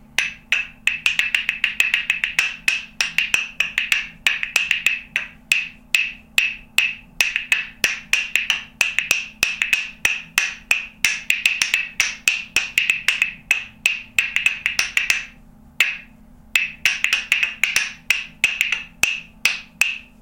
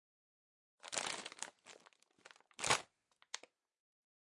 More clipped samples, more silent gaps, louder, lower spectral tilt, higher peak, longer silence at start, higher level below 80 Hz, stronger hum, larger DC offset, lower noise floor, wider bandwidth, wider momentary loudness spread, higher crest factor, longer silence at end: neither; neither; first, -19 LUFS vs -41 LUFS; second, 1.5 dB/octave vs -0.5 dB/octave; first, 0 dBFS vs -18 dBFS; second, 0.2 s vs 0.85 s; first, -52 dBFS vs -80 dBFS; neither; neither; second, -46 dBFS vs -74 dBFS; first, 17 kHz vs 11.5 kHz; second, 4 LU vs 26 LU; second, 22 dB vs 28 dB; second, 0.15 s vs 1 s